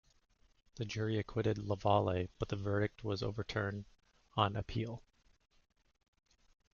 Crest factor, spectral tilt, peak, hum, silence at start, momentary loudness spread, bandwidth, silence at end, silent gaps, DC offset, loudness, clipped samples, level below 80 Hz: 24 dB; -5.5 dB/octave; -16 dBFS; none; 0.75 s; 10 LU; 7 kHz; 1.75 s; none; under 0.1%; -37 LUFS; under 0.1%; -60 dBFS